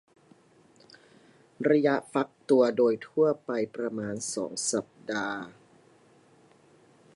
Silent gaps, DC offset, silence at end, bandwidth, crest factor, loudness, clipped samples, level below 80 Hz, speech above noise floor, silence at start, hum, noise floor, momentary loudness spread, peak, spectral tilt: none; under 0.1%; 1.65 s; 11.5 kHz; 20 dB; -28 LUFS; under 0.1%; -76 dBFS; 33 dB; 1.6 s; none; -60 dBFS; 10 LU; -10 dBFS; -4.5 dB/octave